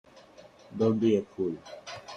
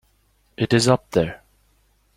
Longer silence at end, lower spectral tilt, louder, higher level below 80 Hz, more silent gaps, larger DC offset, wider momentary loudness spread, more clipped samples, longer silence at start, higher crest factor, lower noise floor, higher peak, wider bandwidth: second, 0 s vs 0.8 s; first, -7 dB/octave vs -5 dB/octave; second, -28 LUFS vs -20 LUFS; second, -68 dBFS vs -50 dBFS; neither; neither; first, 17 LU vs 10 LU; neither; about the same, 0.7 s vs 0.6 s; about the same, 18 dB vs 22 dB; second, -53 dBFS vs -62 dBFS; second, -12 dBFS vs -2 dBFS; second, 9 kHz vs 15 kHz